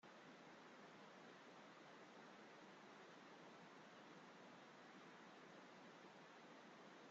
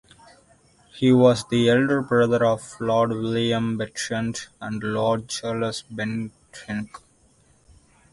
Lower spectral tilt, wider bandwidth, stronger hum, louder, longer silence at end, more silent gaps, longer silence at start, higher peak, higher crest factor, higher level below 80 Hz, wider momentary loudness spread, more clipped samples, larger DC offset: second, -2.5 dB/octave vs -5.5 dB/octave; second, 7.6 kHz vs 11.5 kHz; neither; second, -63 LUFS vs -23 LUFS; second, 0 s vs 1.15 s; neither; second, 0.05 s vs 0.95 s; second, -50 dBFS vs -4 dBFS; second, 12 dB vs 20 dB; second, under -90 dBFS vs -56 dBFS; second, 0 LU vs 14 LU; neither; neither